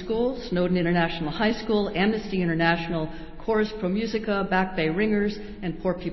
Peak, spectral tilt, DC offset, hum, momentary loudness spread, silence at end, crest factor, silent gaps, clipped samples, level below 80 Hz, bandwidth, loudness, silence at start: -6 dBFS; -7.5 dB/octave; under 0.1%; none; 7 LU; 0 s; 18 dB; none; under 0.1%; -44 dBFS; 6 kHz; -25 LUFS; 0 s